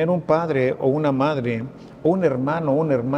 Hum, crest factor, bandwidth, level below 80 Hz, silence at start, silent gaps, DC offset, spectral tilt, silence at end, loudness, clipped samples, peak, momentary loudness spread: none; 16 dB; 9 kHz; -58 dBFS; 0 s; none; under 0.1%; -9 dB/octave; 0 s; -21 LUFS; under 0.1%; -4 dBFS; 6 LU